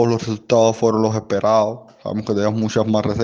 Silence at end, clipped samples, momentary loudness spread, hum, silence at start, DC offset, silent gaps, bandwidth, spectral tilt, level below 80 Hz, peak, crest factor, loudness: 0 s; under 0.1%; 8 LU; none; 0 s; under 0.1%; none; 7.6 kHz; -6.5 dB/octave; -52 dBFS; -2 dBFS; 16 dB; -18 LUFS